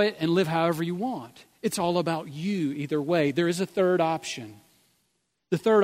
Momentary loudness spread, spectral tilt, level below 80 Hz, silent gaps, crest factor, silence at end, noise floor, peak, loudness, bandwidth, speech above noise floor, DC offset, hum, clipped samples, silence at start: 10 LU; -5.5 dB/octave; -70 dBFS; none; 16 dB; 0 s; -75 dBFS; -10 dBFS; -26 LUFS; 16 kHz; 49 dB; under 0.1%; none; under 0.1%; 0 s